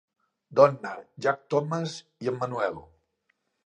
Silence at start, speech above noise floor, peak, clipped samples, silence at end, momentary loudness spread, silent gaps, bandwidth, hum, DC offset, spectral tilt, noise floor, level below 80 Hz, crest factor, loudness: 0.5 s; 48 dB; -4 dBFS; under 0.1%; 0.85 s; 15 LU; none; 9.6 kHz; none; under 0.1%; -6 dB/octave; -75 dBFS; -68 dBFS; 24 dB; -27 LUFS